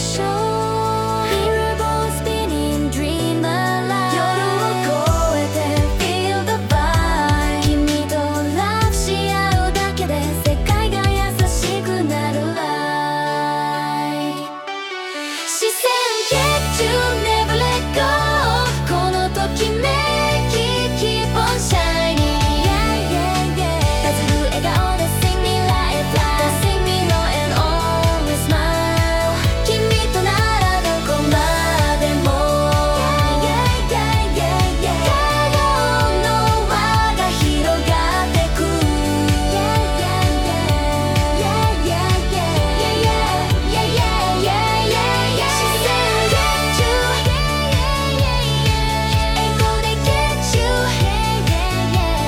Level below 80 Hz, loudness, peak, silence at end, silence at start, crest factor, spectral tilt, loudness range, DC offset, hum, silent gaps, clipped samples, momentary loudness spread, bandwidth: -24 dBFS; -17 LUFS; -4 dBFS; 0 s; 0 s; 14 dB; -4.5 dB/octave; 3 LU; under 0.1%; none; none; under 0.1%; 4 LU; 18 kHz